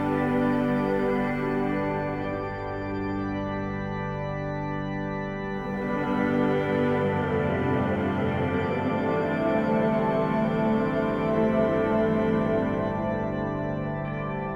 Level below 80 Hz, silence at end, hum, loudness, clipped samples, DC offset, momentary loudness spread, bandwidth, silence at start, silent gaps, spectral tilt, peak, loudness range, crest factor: -46 dBFS; 0 s; 50 Hz at -55 dBFS; -26 LUFS; under 0.1%; under 0.1%; 7 LU; 7.8 kHz; 0 s; none; -8.5 dB/octave; -10 dBFS; 6 LU; 16 dB